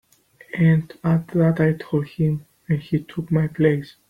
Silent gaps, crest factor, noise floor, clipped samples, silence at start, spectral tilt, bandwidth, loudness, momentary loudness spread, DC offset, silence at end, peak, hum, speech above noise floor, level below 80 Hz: none; 16 dB; -52 dBFS; under 0.1%; 0.55 s; -9.5 dB/octave; 5 kHz; -21 LUFS; 8 LU; under 0.1%; 0.2 s; -4 dBFS; none; 31 dB; -52 dBFS